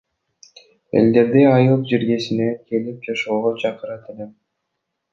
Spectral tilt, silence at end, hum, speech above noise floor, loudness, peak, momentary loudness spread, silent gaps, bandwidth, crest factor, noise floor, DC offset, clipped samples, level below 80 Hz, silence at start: -7.5 dB/octave; 0.8 s; none; 59 dB; -18 LUFS; -2 dBFS; 19 LU; none; 7.4 kHz; 18 dB; -77 dBFS; under 0.1%; under 0.1%; -60 dBFS; 0.95 s